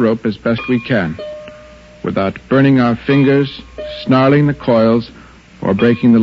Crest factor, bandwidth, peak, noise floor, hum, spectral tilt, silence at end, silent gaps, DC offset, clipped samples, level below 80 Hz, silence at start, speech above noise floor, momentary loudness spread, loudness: 14 dB; 7.2 kHz; 0 dBFS; -38 dBFS; none; -9 dB/octave; 0 s; none; under 0.1%; under 0.1%; -44 dBFS; 0 s; 26 dB; 16 LU; -14 LUFS